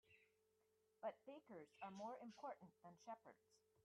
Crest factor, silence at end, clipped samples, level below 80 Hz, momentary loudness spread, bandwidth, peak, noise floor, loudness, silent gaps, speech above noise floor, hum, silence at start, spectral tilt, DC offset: 20 dB; 0.05 s; under 0.1%; under -90 dBFS; 8 LU; 10 kHz; -38 dBFS; -84 dBFS; -58 LUFS; none; 25 dB; none; 0.05 s; -5.5 dB/octave; under 0.1%